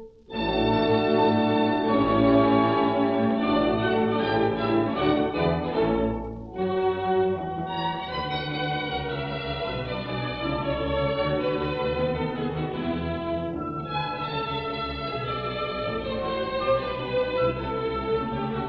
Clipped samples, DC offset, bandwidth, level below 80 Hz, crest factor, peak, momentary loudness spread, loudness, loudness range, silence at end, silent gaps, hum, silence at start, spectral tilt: under 0.1%; under 0.1%; 5.8 kHz; -44 dBFS; 18 dB; -6 dBFS; 8 LU; -26 LUFS; 7 LU; 0 s; none; none; 0 s; -9 dB/octave